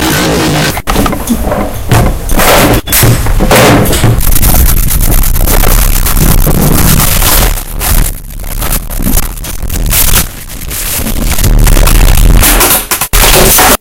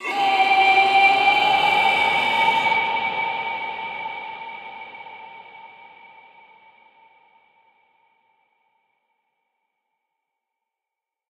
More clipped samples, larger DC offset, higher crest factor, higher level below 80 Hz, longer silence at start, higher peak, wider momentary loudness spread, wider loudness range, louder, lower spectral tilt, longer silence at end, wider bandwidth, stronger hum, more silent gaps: first, 2% vs under 0.1%; first, 2% vs under 0.1%; second, 6 dB vs 18 dB; first, -10 dBFS vs -70 dBFS; about the same, 0 s vs 0 s; first, 0 dBFS vs -4 dBFS; second, 9 LU vs 22 LU; second, 5 LU vs 23 LU; first, -8 LUFS vs -18 LUFS; first, -3.5 dB/octave vs -2 dB/octave; second, 0.05 s vs 5.6 s; first, over 20 kHz vs 13.5 kHz; neither; neither